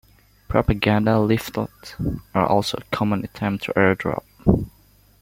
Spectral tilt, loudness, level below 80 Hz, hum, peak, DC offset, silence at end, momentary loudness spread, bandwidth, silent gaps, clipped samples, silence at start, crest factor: -6.5 dB/octave; -22 LUFS; -38 dBFS; none; -2 dBFS; under 0.1%; 0.5 s; 10 LU; 16.5 kHz; none; under 0.1%; 0.5 s; 20 dB